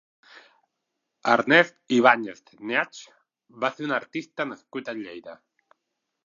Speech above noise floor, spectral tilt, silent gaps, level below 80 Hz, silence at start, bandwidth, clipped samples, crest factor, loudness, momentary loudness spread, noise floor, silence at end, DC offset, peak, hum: 57 dB; -4.5 dB/octave; none; -80 dBFS; 1.25 s; 7.4 kHz; under 0.1%; 24 dB; -24 LUFS; 19 LU; -81 dBFS; 0.9 s; under 0.1%; -2 dBFS; none